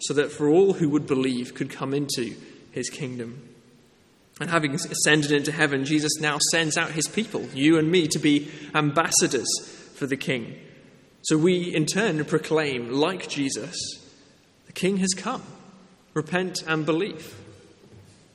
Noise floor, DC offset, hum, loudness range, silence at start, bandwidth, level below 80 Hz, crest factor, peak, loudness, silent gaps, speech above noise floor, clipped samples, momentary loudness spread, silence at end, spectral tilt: -58 dBFS; under 0.1%; none; 7 LU; 0 s; 14 kHz; -66 dBFS; 22 dB; -4 dBFS; -24 LUFS; none; 34 dB; under 0.1%; 13 LU; 0.35 s; -4 dB/octave